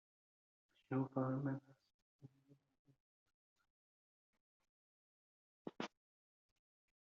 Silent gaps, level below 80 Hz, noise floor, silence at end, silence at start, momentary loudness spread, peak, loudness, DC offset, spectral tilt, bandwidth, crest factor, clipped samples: 1.94-2.19 s, 2.79-2.85 s, 3.00-3.26 s, 3.34-3.56 s, 3.70-4.33 s, 4.40-4.60 s, 4.69-5.65 s; -90 dBFS; -74 dBFS; 1.2 s; 0.9 s; 13 LU; -26 dBFS; -44 LUFS; under 0.1%; -7 dB/octave; 7.2 kHz; 24 dB; under 0.1%